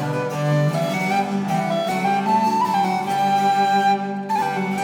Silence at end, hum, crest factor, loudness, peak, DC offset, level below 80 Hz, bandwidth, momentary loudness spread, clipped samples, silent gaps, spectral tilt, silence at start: 0 s; none; 12 dB; -20 LUFS; -8 dBFS; under 0.1%; -68 dBFS; 18.5 kHz; 5 LU; under 0.1%; none; -6 dB/octave; 0 s